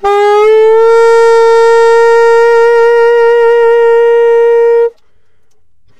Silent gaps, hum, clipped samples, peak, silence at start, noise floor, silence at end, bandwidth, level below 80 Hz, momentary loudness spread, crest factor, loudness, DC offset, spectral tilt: none; none; under 0.1%; -2 dBFS; 0 s; -59 dBFS; 0 s; 8.8 kHz; -50 dBFS; 2 LU; 6 dB; -6 LUFS; 4%; -2 dB/octave